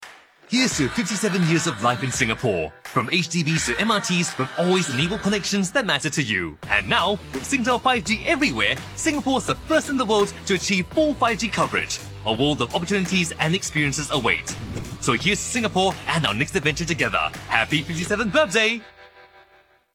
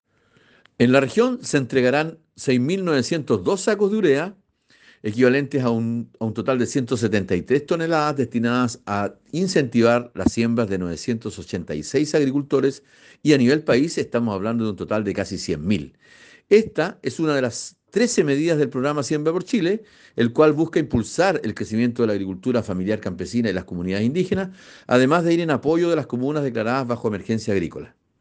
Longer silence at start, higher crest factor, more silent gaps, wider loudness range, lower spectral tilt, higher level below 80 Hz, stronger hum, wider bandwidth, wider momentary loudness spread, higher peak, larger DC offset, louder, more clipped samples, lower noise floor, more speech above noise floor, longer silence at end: second, 0 s vs 0.8 s; about the same, 22 dB vs 18 dB; neither; about the same, 1 LU vs 2 LU; second, -4 dB/octave vs -6 dB/octave; first, -46 dBFS vs -52 dBFS; neither; first, 16.5 kHz vs 9.8 kHz; second, 5 LU vs 9 LU; about the same, -2 dBFS vs -4 dBFS; neither; about the same, -22 LUFS vs -21 LUFS; neither; about the same, -57 dBFS vs -59 dBFS; about the same, 35 dB vs 38 dB; first, 0.7 s vs 0.35 s